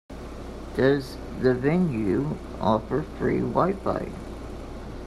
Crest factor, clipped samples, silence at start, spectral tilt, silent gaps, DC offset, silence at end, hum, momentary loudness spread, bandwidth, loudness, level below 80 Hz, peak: 20 dB; under 0.1%; 0.1 s; -8 dB/octave; none; under 0.1%; 0 s; none; 16 LU; 13 kHz; -25 LUFS; -42 dBFS; -6 dBFS